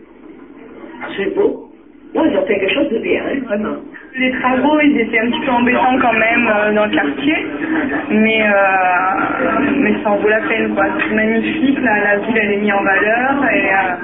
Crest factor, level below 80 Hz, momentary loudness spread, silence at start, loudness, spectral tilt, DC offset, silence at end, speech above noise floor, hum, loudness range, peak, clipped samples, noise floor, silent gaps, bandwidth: 12 dB; -50 dBFS; 7 LU; 0.2 s; -14 LUFS; -9 dB/octave; 0.3%; 0 s; 23 dB; none; 4 LU; -2 dBFS; under 0.1%; -38 dBFS; none; 3.9 kHz